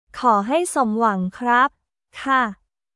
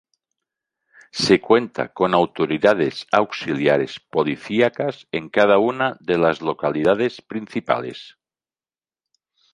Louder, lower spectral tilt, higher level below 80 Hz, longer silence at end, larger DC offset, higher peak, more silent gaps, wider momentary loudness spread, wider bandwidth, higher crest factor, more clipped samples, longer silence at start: about the same, -20 LUFS vs -20 LUFS; about the same, -4.5 dB/octave vs -5.5 dB/octave; about the same, -60 dBFS vs -58 dBFS; second, 0.4 s vs 1.45 s; neither; about the same, -4 dBFS vs -2 dBFS; neither; second, 6 LU vs 11 LU; about the same, 12 kHz vs 11.5 kHz; about the same, 16 dB vs 20 dB; neither; second, 0.15 s vs 1.15 s